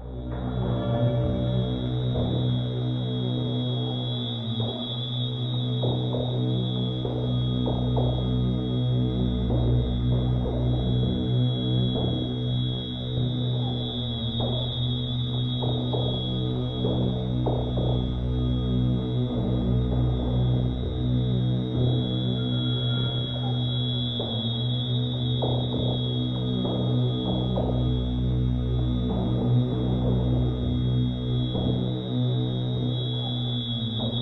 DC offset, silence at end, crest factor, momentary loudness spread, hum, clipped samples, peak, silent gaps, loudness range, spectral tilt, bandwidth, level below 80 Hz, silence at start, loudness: under 0.1%; 0 s; 14 dB; 3 LU; none; under 0.1%; -12 dBFS; none; 2 LU; -9.5 dB/octave; 4.2 kHz; -36 dBFS; 0 s; -26 LUFS